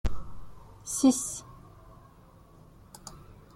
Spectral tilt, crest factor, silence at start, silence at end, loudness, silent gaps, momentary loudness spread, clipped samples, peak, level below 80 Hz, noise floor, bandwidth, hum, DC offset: -4.5 dB/octave; 20 dB; 0.05 s; 0.2 s; -28 LUFS; none; 28 LU; under 0.1%; -12 dBFS; -44 dBFS; -55 dBFS; 15 kHz; none; under 0.1%